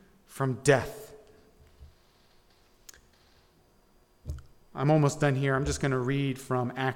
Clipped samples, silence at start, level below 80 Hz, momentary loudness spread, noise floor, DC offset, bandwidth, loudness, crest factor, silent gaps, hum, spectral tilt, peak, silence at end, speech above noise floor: under 0.1%; 0.3 s; -50 dBFS; 21 LU; -63 dBFS; under 0.1%; 16.5 kHz; -28 LUFS; 22 dB; none; none; -6 dB/octave; -8 dBFS; 0 s; 36 dB